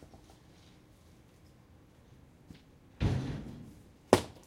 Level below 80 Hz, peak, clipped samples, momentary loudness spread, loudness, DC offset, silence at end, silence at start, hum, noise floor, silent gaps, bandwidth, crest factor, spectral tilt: -50 dBFS; -2 dBFS; under 0.1%; 29 LU; -33 LUFS; under 0.1%; 0.15 s; 0 s; none; -60 dBFS; none; 16.5 kHz; 34 dB; -6 dB/octave